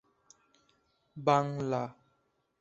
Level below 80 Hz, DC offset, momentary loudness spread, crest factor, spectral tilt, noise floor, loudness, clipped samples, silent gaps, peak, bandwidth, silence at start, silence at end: -72 dBFS; under 0.1%; 15 LU; 24 dB; -6.5 dB/octave; -76 dBFS; -31 LUFS; under 0.1%; none; -12 dBFS; 8 kHz; 1.15 s; 0.7 s